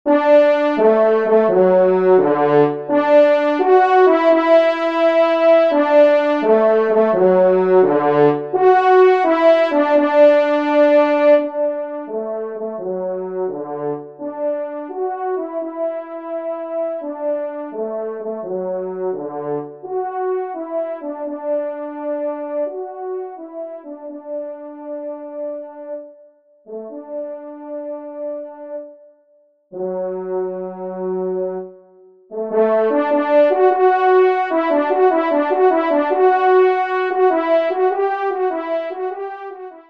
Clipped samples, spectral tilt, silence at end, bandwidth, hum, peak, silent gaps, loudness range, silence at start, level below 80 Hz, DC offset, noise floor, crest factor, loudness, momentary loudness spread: under 0.1%; -7.5 dB/octave; 0.1 s; 6.2 kHz; none; -2 dBFS; none; 17 LU; 0.05 s; -72 dBFS; 0.1%; -56 dBFS; 16 dB; -16 LUFS; 17 LU